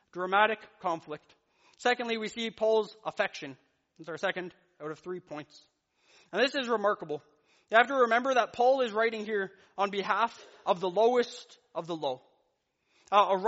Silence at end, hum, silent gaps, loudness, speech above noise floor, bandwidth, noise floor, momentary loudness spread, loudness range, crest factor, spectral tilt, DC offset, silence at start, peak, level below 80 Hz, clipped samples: 0 s; none; none; -29 LUFS; 47 dB; 8 kHz; -77 dBFS; 17 LU; 7 LU; 24 dB; -1.5 dB/octave; under 0.1%; 0.15 s; -8 dBFS; -80 dBFS; under 0.1%